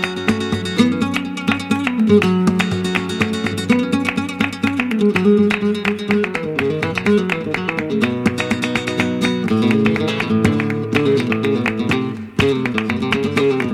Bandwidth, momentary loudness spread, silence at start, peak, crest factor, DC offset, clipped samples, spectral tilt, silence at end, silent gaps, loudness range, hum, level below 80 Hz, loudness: 14.5 kHz; 6 LU; 0 s; 0 dBFS; 16 dB; under 0.1%; under 0.1%; -6 dB/octave; 0 s; none; 1 LU; none; -48 dBFS; -18 LUFS